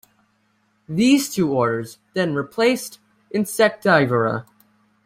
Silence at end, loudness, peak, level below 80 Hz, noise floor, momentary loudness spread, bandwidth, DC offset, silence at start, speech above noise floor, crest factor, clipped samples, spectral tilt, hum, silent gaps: 0.65 s; -20 LUFS; -2 dBFS; -62 dBFS; -65 dBFS; 12 LU; 16 kHz; under 0.1%; 0.9 s; 45 dB; 18 dB; under 0.1%; -5 dB/octave; none; none